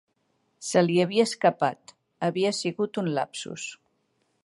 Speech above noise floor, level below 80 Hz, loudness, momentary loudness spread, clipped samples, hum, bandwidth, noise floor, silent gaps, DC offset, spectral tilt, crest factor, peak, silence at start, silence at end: 47 dB; -76 dBFS; -26 LUFS; 14 LU; under 0.1%; none; 11.5 kHz; -72 dBFS; none; under 0.1%; -5 dB/octave; 20 dB; -6 dBFS; 0.6 s; 0.7 s